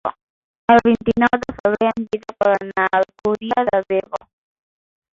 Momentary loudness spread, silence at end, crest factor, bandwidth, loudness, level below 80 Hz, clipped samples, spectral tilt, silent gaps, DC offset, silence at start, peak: 12 LU; 0.95 s; 16 dB; 7.4 kHz; -18 LUFS; -50 dBFS; under 0.1%; -6.5 dB/octave; 0.23-0.68 s, 1.60-1.64 s; under 0.1%; 0.05 s; -2 dBFS